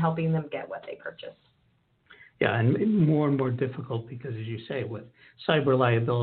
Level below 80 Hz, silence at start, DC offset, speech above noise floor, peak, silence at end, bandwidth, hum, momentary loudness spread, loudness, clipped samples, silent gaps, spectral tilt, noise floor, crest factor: -66 dBFS; 0 s; under 0.1%; 41 dB; -8 dBFS; 0 s; 4.4 kHz; none; 16 LU; -27 LUFS; under 0.1%; none; -6.5 dB/octave; -68 dBFS; 20 dB